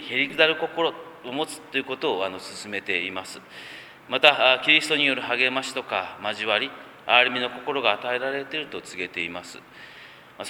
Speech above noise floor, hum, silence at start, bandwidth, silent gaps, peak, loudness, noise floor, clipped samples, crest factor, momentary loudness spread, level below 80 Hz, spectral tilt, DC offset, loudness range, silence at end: 22 dB; none; 0 s; 19 kHz; none; 0 dBFS; -23 LUFS; -47 dBFS; under 0.1%; 26 dB; 21 LU; -70 dBFS; -2.5 dB/octave; under 0.1%; 8 LU; 0 s